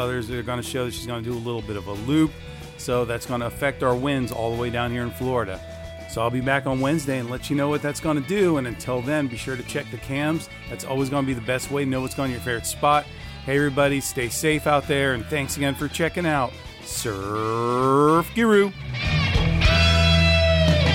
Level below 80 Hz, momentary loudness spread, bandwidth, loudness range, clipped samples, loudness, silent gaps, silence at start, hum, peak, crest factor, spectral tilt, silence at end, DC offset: -36 dBFS; 12 LU; 17 kHz; 6 LU; under 0.1%; -23 LUFS; none; 0 s; none; -6 dBFS; 16 dB; -5 dB/octave; 0 s; under 0.1%